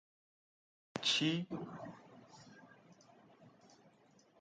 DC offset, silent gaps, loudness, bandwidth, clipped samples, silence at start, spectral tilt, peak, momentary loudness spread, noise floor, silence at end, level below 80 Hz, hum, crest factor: under 0.1%; none; -37 LUFS; 9 kHz; under 0.1%; 0.95 s; -3.5 dB/octave; -20 dBFS; 27 LU; -68 dBFS; 0.9 s; -82 dBFS; none; 24 dB